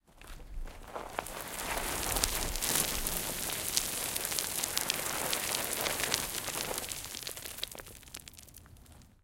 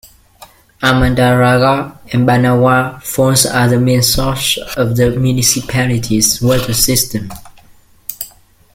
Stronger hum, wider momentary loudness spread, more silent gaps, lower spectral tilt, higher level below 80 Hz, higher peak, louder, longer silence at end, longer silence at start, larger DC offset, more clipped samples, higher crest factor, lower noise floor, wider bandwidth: neither; first, 17 LU vs 12 LU; neither; second, -1 dB/octave vs -4 dB/octave; second, -48 dBFS vs -32 dBFS; second, -4 dBFS vs 0 dBFS; second, -33 LUFS vs -12 LUFS; second, 0.15 s vs 0.5 s; second, 0.15 s vs 0.4 s; neither; neither; first, 32 dB vs 14 dB; first, -56 dBFS vs -45 dBFS; about the same, 17 kHz vs 17 kHz